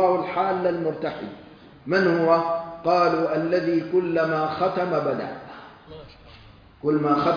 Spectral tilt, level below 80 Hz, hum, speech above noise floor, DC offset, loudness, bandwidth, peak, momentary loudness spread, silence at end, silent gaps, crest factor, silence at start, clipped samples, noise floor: -8 dB/octave; -58 dBFS; none; 26 dB; under 0.1%; -23 LUFS; 5.2 kHz; -6 dBFS; 22 LU; 0 s; none; 18 dB; 0 s; under 0.1%; -48 dBFS